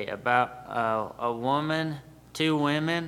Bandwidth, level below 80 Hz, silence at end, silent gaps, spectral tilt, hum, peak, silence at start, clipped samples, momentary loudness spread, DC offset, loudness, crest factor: 15.5 kHz; -62 dBFS; 0 s; none; -5.5 dB/octave; none; -8 dBFS; 0 s; under 0.1%; 8 LU; under 0.1%; -27 LUFS; 20 dB